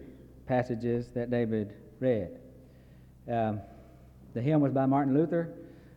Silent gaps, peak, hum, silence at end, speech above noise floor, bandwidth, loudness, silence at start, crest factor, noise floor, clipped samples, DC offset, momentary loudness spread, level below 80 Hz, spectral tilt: none; -14 dBFS; none; 0 s; 25 dB; 7.8 kHz; -30 LUFS; 0 s; 16 dB; -54 dBFS; under 0.1%; under 0.1%; 23 LU; -58 dBFS; -10 dB/octave